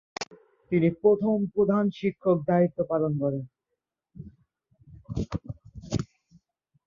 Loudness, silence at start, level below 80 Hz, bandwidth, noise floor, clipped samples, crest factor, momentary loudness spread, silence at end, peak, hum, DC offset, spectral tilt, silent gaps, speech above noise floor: -26 LUFS; 0.2 s; -52 dBFS; 7.4 kHz; -84 dBFS; under 0.1%; 18 dB; 20 LU; 0.8 s; -10 dBFS; none; under 0.1%; -8 dB/octave; none; 59 dB